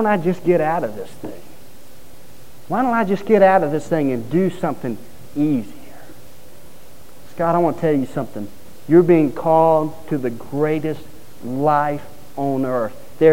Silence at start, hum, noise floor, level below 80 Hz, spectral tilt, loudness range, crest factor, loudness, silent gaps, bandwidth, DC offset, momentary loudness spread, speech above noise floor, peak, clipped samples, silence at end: 0 s; none; -46 dBFS; -54 dBFS; -8 dB/octave; 6 LU; 18 dB; -19 LUFS; none; 16.5 kHz; 3%; 19 LU; 28 dB; -2 dBFS; under 0.1%; 0 s